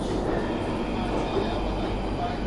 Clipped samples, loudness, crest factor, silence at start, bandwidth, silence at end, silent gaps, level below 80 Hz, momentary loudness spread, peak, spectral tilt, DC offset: under 0.1%; -28 LUFS; 14 dB; 0 s; 11.5 kHz; 0 s; none; -34 dBFS; 2 LU; -12 dBFS; -6.5 dB/octave; under 0.1%